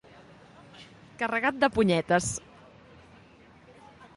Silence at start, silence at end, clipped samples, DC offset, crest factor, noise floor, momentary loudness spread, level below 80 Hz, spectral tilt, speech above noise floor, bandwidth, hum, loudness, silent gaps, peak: 0.75 s; 0.1 s; under 0.1%; under 0.1%; 22 dB; -55 dBFS; 26 LU; -58 dBFS; -4.5 dB/octave; 29 dB; 11.5 kHz; none; -26 LUFS; none; -8 dBFS